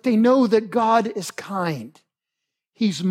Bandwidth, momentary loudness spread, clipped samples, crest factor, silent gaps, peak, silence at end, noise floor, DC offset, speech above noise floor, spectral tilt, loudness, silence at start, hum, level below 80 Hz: 14.5 kHz; 12 LU; under 0.1%; 16 dB; none; -6 dBFS; 0 s; -83 dBFS; under 0.1%; 63 dB; -6 dB/octave; -20 LUFS; 0.05 s; none; -76 dBFS